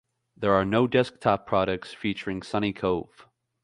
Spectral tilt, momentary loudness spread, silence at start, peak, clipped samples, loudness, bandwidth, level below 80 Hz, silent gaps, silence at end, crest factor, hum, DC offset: -7 dB/octave; 8 LU; 0.4 s; -6 dBFS; under 0.1%; -26 LUFS; 11 kHz; -54 dBFS; none; 0.6 s; 20 dB; none; under 0.1%